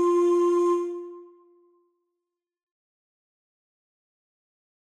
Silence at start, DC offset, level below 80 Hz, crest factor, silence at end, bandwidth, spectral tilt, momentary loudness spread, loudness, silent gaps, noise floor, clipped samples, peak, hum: 0 s; under 0.1%; under -90 dBFS; 14 dB; 3.6 s; 9.4 kHz; -4 dB/octave; 17 LU; -23 LUFS; none; -86 dBFS; under 0.1%; -14 dBFS; none